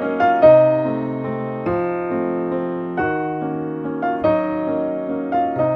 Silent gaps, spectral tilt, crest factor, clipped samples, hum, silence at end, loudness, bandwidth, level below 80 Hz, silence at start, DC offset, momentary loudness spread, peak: none; -9.5 dB/octave; 18 dB; under 0.1%; none; 0 s; -19 LUFS; 5.4 kHz; -52 dBFS; 0 s; under 0.1%; 12 LU; -2 dBFS